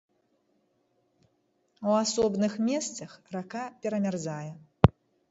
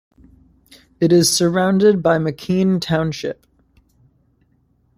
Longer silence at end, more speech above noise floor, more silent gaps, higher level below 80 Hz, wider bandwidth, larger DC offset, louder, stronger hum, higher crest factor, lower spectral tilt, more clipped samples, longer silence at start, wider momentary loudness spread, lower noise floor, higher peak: second, 0.4 s vs 1.65 s; about the same, 43 dB vs 44 dB; neither; about the same, -48 dBFS vs -52 dBFS; second, 8 kHz vs 15.5 kHz; neither; second, -29 LUFS vs -17 LUFS; neither; first, 30 dB vs 16 dB; about the same, -5.5 dB/octave vs -5 dB/octave; neither; first, 1.8 s vs 1 s; first, 14 LU vs 11 LU; first, -73 dBFS vs -60 dBFS; about the same, 0 dBFS vs -2 dBFS